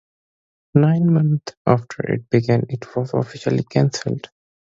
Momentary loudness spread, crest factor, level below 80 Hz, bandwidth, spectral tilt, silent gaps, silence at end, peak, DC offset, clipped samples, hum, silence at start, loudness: 9 LU; 20 dB; -56 dBFS; 7.8 kHz; -7.5 dB/octave; 1.57-1.65 s; 0.45 s; 0 dBFS; under 0.1%; under 0.1%; none; 0.75 s; -20 LUFS